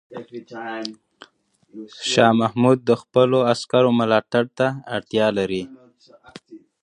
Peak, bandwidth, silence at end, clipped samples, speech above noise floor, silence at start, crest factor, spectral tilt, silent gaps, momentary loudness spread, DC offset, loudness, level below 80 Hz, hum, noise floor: -2 dBFS; 10.5 kHz; 0.25 s; under 0.1%; 30 dB; 0.1 s; 20 dB; -5.5 dB/octave; none; 19 LU; under 0.1%; -19 LUFS; -62 dBFS; none; -50 dBFS